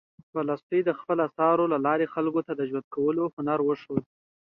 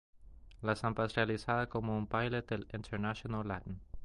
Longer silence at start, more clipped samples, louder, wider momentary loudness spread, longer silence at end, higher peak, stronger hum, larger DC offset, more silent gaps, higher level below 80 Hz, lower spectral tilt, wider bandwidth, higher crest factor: first, 0.35 s vs 0.15 s; neither; first, -27 LUFS vs -37 LUFS; about the same, 8 LU vs 8 LU; first, 0.45 s vs 0 s; first, -10 dBFS vs -14 dBFS; neither; neither; first, 0.63-0.70 s, 2.84-2.91 s, 3.33-3.37 s vs none; second, -70 dBFS vs -54 dBFS; first, -10 dB/octave vs -7 dB/octave; second, 5.4 kHz vs 11.5 kHz; second, 16 dB vs 22 dB